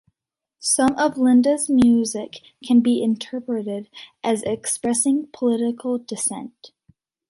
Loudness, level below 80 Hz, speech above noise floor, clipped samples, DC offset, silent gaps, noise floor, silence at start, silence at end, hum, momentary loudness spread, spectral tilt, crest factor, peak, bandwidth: -20 LUFS; -56 dBFS; 65 dB; under 0.1%; under 0.1%; none; -85 dBFS; 0.6 s; 0.65 s; none; 14 LU; -3.5 dB/octave; 14 dB; -6 dBFS; 11.5 kHz